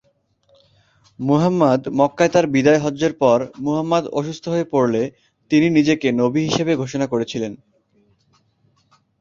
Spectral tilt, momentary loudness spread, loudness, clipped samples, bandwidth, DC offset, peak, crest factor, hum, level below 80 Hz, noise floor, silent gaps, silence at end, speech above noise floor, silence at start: -6 dB/octave; 9 LU; -18 LUFS; under 0.1%; 7.6 kHz; under 0.1%; -2 dBFS; 18 dB; none; -56 dBFS; -62 dBFS; none; 1.65 s; 44 dB; 1.2 s